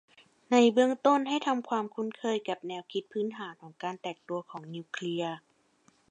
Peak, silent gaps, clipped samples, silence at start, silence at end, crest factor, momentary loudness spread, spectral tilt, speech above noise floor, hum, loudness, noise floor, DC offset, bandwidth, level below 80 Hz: -10 dBFS; none; under 0.1%; 0.5 s; 0.75 s; 22 dB; 16 LU; -5 dB/octave; 37 dB; none; -30 LUFS; -67 dBFS; under 0.1%; 9 kHz; -86 dBFS